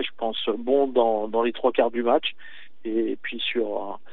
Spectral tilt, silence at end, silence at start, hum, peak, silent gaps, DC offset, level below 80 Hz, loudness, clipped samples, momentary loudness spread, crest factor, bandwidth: -1 dB/octave; 0.15 s; 0 s; none; -6 dBFS; none; 2%; -80 dBFS; -24 LUFS; under 0.1%; 8 LU; 18 dB; 4.5 kHz